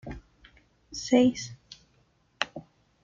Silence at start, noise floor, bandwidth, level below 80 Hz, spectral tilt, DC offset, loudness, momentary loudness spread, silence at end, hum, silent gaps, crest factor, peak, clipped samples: 0.05 s; -67 dBFS; 7.6 kHz; -56 dBFS; -4 dB/octave; under 0.1%; -27 LUFS; 26 LU; 0.45 s; none; none; 26 dB; -6 dBFS; under 0.1%